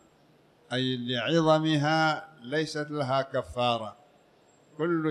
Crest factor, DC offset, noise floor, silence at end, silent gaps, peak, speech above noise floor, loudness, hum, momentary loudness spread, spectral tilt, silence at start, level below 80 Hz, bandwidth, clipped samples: 18 dB; under 0.1%; -61 dBFS; 0 s; none; -10 dBFS; 34 dB; -28 LUFS; none; 10 LU; -6 dB/octave; 0.7 s; -62 dBFS; 11 kHz; under 0.1%